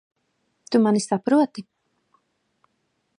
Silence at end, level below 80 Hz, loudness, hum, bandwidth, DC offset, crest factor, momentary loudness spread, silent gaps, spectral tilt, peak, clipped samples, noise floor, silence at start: 1.6 s; -78 dBFS; -21 LUFS; none; 11 kHz; under 0.1%; 18 dB; 7 LU; none; -5.5 dB/octave; -6 dBFS; under 0.1%; -72 dBFS; 0.7 s